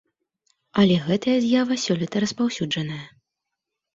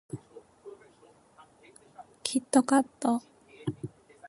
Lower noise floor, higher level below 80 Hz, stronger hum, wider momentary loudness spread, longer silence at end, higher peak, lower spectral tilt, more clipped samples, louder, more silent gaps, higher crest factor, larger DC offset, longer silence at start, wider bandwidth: first, -83 dBFS vs -60 dBFS; first, -60 dBFS vs -72 dBFS; neither; second, 9 LU vs 26 LU; first, 0.85 s vs 0.4 s; first, -6 dBFS vs -10 dBFS; about the same, -5.5 dB/octave vs -4.5 dB/octave; neither; first, -22 LUFS vs -29 LUFS; neither; about the same, 18 dB vs 22 dB; neither; first, 0.75 s vs 0.15 s; second, 7.8 kHz vs 11.5 kHz